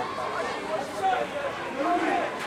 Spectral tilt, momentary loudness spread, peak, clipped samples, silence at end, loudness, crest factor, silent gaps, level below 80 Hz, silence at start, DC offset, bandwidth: -4 dB/octave; 6 LU; -14 dBFS; under 0.1%; 0 s; -28 LUFS; 14 dB; none; -62 dBFS; 0 s; under 0.1%; 15 kHz